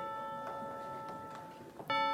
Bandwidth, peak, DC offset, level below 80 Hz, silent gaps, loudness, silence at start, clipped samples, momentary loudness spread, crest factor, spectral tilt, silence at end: 16.5 kHz; -22 dBFS; under 0.1%; -76 dBFS; none; -42 LUFS; 0 s; under 0.1%; 12 LU; 18 dB; -4.5 dB/octave; 0 s